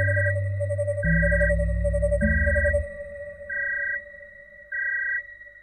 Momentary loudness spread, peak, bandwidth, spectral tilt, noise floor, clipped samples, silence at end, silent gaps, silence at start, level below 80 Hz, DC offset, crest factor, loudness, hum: 16 LU; -10 dBFS; 10 kHz; -9 dB/octave; -46 dBFS; under 0.1%; 0.05 s; none; 0 s; -30 dBFS; under 0.1%; 14 dB; -25 LUFS; none